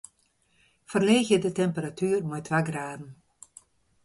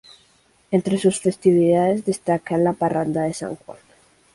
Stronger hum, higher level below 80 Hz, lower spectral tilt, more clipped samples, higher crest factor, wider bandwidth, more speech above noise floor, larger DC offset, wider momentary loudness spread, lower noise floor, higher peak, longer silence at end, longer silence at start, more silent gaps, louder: neither; second, -66 dBFS vs -58 dBFS; about the same, -5.5 dB/octave vs -6.5 dB/octave; neither; about the same, 20 dB vs 16 dB; about the same, 11.5 kHz vs 11.5 kHz; first, 43 dB vs 39 dB; neither; first, 15 LU vs 9 LU; first, -68 dBFS vs -59 dBFS; about the same, -8 dBFS vs -6 dBFS; first, 0.9 s vs 0.6 s; first, 0.9 s vs 0.7 s; neither; second, -26 LUFS vs -20 LUFS